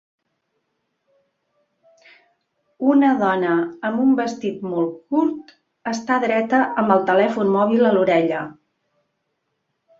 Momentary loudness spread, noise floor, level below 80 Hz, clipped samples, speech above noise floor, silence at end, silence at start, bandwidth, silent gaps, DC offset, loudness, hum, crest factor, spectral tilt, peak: 11 LU; -74 dBFS; -68 dBFS; under 0.1%; 56 dB; 1.45 s; 2.8 s; 7.6 kHz; none; under 0.1%; -19 LUFS; none; 18 dB; -6.5 dB/octave; -2 dBFS